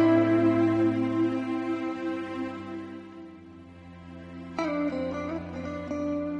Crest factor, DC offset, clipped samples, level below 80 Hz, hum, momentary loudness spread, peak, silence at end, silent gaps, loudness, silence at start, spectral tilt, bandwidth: 16 dB; under 0.1%; under 0.1%; -60 dBFS; none; 23 LU; -12 dBFS; 0 s; none; -28 LUFS; 0 s; -8 dB/octave; 7 kHz